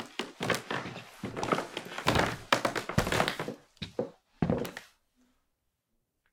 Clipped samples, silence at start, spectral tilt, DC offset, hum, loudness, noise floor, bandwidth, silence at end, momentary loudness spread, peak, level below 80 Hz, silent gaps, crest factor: under 0.1%; 0 s; -4.5 dB/octave; under 0.1%; none; -32 LUFS; -79 dBFS; 18 kHz; 1.45 s; 13 LU; -6 dBFS; -52 dBFS; none; 28 dB